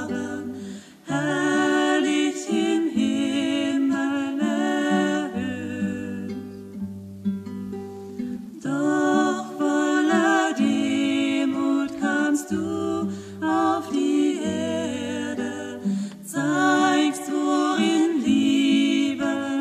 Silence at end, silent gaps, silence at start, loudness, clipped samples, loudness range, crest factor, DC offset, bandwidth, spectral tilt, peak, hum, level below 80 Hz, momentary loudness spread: 0 s; none; 0 s; -23 LUFS; under 0.1%; 6 LU; 14 dB; under 0.1%; 14 kHz; -4.5 dB/octave; -8 dBFS; none; -64 dBFS; 12 LU